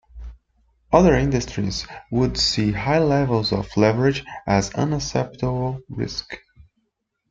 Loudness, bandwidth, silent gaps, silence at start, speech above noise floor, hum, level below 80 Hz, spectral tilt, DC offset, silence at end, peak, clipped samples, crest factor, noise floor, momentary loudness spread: -21 LUFS; 8.8 kHz; none; 0.15 s; 54 dB; none; -38 dBFS; -5.5 dB/octave; under 0.1%; 0.95 s; -2 dBFS; under 0.1%; 20 dB; -75 dBFS; 12 LU